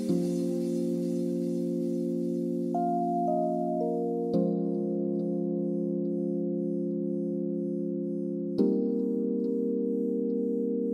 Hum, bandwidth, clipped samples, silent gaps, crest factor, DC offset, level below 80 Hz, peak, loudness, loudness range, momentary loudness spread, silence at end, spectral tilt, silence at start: none; 12.5 kHz; under 0.1%; none; 16 dB; under 0.1%; -76 dBFS; -12 dBFS; -30 LUFS; 2 LU; 3 LU; 0 s; -9.5 dB/octave; 0 s